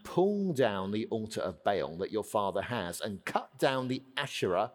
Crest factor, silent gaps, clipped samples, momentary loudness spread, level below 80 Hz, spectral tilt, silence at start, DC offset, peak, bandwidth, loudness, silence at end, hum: 20 dB; none; under 0.1%; 6 LU; -68 dBFS; -5 dB/octave; 0.05 s; under 0.1%; -12 dBFS; 19 kHz; -33 LUFS; 0 s; none